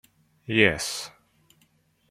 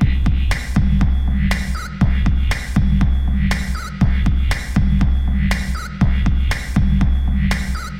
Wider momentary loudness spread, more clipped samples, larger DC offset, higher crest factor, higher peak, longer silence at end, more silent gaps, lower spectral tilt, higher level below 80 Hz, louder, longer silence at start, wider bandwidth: first, 21 LU vs 3 LU; neither; neither; first, 26 dB vs 14 dB; about the same, -2 dBFS vs -2 dBFS; first, 1 s vs 0 s; neither; second, -3.5 dB/octave vs -6.5 dB/octave; second, -58 dBFS vs -18 dBFS; second, -23 LUFS vs -19 LUFS; first, 0.5 s vs 0 s; first, 15.5 kHz vs 13.5 kHz